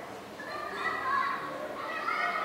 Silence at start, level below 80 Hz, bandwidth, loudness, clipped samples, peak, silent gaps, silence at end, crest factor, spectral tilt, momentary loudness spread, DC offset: 0 s; -68 dBFS; 16 kHz; -33 LUFS; under 0.1%; -18 dBFS; none; 0 s; 14 dB; -3.5 dB/octave; 10 LU; under 0.1%